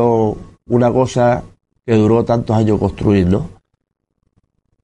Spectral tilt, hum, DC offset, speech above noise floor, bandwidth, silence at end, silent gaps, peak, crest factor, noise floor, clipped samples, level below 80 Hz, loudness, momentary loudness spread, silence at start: -8 dB/octave; none; under 0.1%; 49 dB; 10 kHz; 1.35 s; none; -2 dBFS; 14 dB; -63 dBFS; under 0.1%; -40 dBFS; -15 LUFS; 8 LU; 0 s